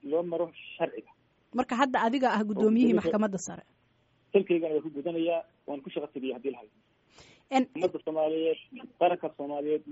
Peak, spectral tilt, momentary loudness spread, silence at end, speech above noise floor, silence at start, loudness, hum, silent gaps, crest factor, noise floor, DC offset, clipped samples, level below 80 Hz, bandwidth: -10 dBFS; -4.5 dB/octave; 12 LU; 0 s; 39 dB; 0.05 s; -29 LUFS; none; none; 20 dB; -68 dBFS; under 0.1%; under 0.1%; -72 dBFS; 8 kHz